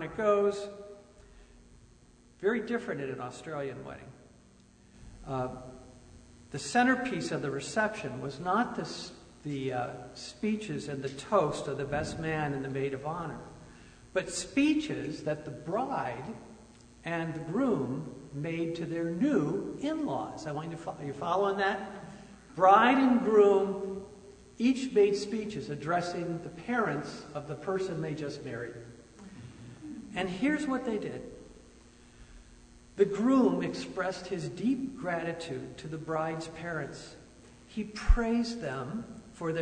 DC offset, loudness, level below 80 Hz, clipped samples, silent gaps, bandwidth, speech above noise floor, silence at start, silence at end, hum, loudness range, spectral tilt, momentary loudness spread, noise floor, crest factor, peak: under 0.1%; -31 LUFS; -46 dBFS; under 0.1%; none; 9.6 kHz; 28 dB; 0 s; 0 s; none; 11 LU; -5.5 dB/octave; 19 LU; -59 dBFS; 22 dB; -10 dBFS